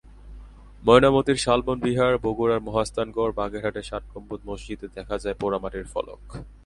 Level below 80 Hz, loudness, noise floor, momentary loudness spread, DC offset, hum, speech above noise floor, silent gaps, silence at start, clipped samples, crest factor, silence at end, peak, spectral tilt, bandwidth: -42 dBFS; -23 LUFS; -44 dBFS; 18 LU; under 0.1%; none; 20 dB; none; 0.25 s; under 0.1%; 24 dB; 0.1 s; 0 dBFS; -5.5 dB/octave; 11.5 kHz